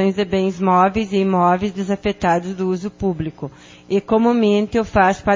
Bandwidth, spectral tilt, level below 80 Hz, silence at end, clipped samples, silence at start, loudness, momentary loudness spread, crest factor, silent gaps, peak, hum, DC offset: 7.6 kHz; -7 dB/octave; -42 dBFS; 0 s; under 0.1%; 0 s; -18 LUFS; 8 LU; 16 dB; none; -2 dBFS; none; under 0.1%